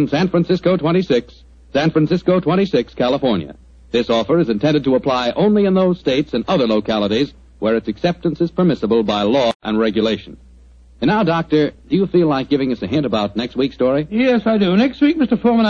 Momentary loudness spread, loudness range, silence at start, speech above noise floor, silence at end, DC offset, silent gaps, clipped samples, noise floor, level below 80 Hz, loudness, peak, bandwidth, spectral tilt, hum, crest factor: 5 LU; 2 LU; 0 s; 28 dB; 0 s; under 0.1%; 9.55-9.60 s; under 0.1%; -44 dBFS; -44 dBFS; -17 LUFS; -4 dBFS; 7.2 kHz; -7.5 dB/octave; none; 14 dB